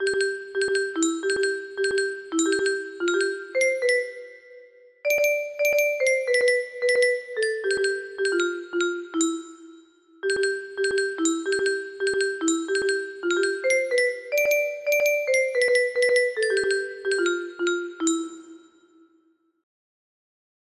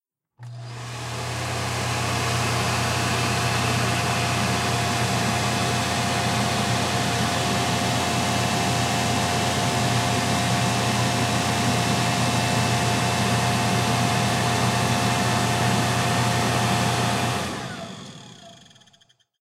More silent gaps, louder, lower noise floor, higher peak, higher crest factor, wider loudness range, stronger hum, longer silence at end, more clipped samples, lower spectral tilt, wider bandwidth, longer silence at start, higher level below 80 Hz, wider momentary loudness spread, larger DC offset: neither; about the same, -24 LUFS vs -22 LUFS; first, -65 dBFS vs -60 dBFS; about the same, -10 dBFS vs -8 dBFS; about the same, 16 dB vs 14 dB; first, 5 LU vs 2 LU; neither; first, 2.05 s vs 0.85 s; neither; second, -1 dB/octave vs -4 dB/octave; second, 13 kHz vs 16 kHz; second, 0 s vs 0.4 s; second, -68 dBFS vs -48 dBFS; about the same, 6 LU vs 6 LU; neither